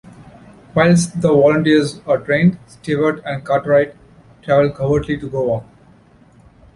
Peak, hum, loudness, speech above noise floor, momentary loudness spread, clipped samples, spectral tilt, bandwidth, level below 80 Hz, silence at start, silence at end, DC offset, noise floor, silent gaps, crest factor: -2 dBFS; none; -16 LUFS; 33 dB; 10 LU; under 0.1%; -6.5 dB/octave; 11.5 kHz; -46 dBFS; 0.2 s; 1.15 s; under 0.1%; -48 dBFS; none; 16 dB